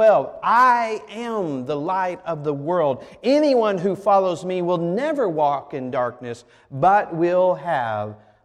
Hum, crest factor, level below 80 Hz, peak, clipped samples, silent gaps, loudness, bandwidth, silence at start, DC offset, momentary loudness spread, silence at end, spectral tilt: none; 14 dB; -62 dBFS; -6 dBFS; under 0.1%; none; -21 LUFS; 11 kHz; 0 s; under 0.1%; 10 LU; 0.3 s; -6.5 dB/octave